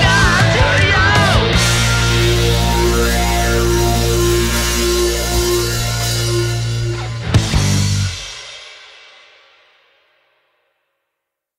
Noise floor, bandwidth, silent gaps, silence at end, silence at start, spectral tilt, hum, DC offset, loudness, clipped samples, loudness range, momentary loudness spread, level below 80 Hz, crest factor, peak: -78 dBFS; 16.5 kHz; none; 2.8 s; 0 s; -4 dB/octave; none; under 0.1%; -14 LUFS; under 0.1%; 9 LU; 10 LU; -22 dBFS; 14 dB; -2 dBFS